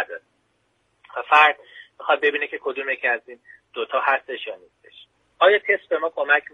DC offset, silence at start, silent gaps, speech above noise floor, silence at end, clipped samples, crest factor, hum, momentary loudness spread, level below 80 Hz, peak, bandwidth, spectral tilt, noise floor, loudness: under 0.1%; 0 s; none; 47 dB; 0.15 s; under 0.1%; 22 dB; none; 19 LU; -76 dBFS; -2 dBFS; 9.4 kHz; -2.5 dB/octave; -68 dBFS; -20 LUFS